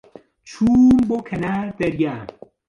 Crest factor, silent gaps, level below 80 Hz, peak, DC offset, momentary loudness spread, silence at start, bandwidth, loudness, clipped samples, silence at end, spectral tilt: 12 dB; none; -46 dBFS; -6 dBFS; under 0.1%; 12 LU; 0.45 s; 7.2 kHz; -18 LUFS; under 0.1%; 0.45 s; -7.5 dB/octave